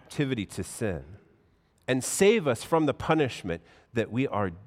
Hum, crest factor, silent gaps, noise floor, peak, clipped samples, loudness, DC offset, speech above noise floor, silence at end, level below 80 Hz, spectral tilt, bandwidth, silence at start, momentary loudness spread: none; 18 dB; none; -65 dBFS; -10 dBFS; under 0.1%; -28 LUFS; under 0.1%; 37 dB; 0 s; -58 dBFS; -5 dB/octave; 16 kHz; 0.1 s; 13 LU